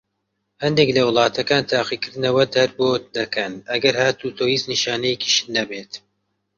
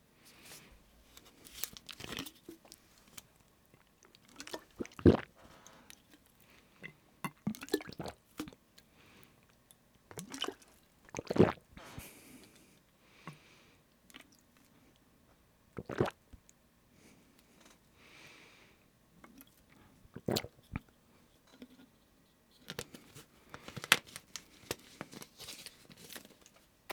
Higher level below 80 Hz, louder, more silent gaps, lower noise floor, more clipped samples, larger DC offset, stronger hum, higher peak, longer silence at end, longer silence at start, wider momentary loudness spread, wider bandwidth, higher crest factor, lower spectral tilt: about the same, -58 dBFS vs -62 dBFS; first, -19 LUFS vs -38 LUFS; neither; first, -74 dBFS vs -68 dBFS; neither; neither; neither; about the same, -2 dBFS vs -2 dBFS; first, 0.6 s vs 0 s; first, 0.6 s vs 0.45 s; second, 8 LU vs 30 LU; second, 7.6 kHz vs over 20 kHz; second, 20 dB vs 40 dB; about the same, -3.5 dB/octave vs -4.5 dB/octave